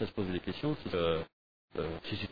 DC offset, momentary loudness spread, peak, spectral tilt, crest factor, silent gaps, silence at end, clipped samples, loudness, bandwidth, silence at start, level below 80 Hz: 0.2%; 8 LU; -20 dBFS; -5 dB/octave; 16 dB; 1.33-1.68 s; 0 s; under 0.1%; -36 LUFS; 5 kHz; 0 s; -56 dBFS